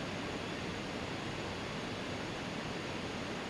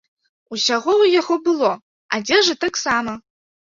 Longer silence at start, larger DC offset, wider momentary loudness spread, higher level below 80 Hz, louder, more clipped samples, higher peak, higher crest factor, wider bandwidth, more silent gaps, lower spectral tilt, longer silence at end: second, 0 s vs 0.5 s; neither; second, 0 LU vs 14 LU; about the same, -58 dBFS vs -60 dBFS; second, -40 LUFS vs -18 LUFS; neither; second, -26 dBFS vs -4 dBFS; about the same, 14 dB vs 16 dB; first, 15 kHz vs 7.6 kHz; second, none vs 1.82-2.09 s; first, -4.5 dB/octave vs -2 dB/octave; second, 0 s vs 0.6 s